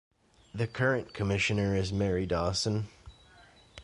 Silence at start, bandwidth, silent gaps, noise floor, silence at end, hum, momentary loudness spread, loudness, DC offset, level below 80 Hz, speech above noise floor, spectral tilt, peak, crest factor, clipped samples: 0.55 s; 11.5 kHz; none; -58 dBFS; 0 s; none; 8 LU; -30 LUFS; under 0.1%; -48 dBFS; 28 dB; -5.5 dB/octave; -14 dBFS; 16 dB; under 0.1%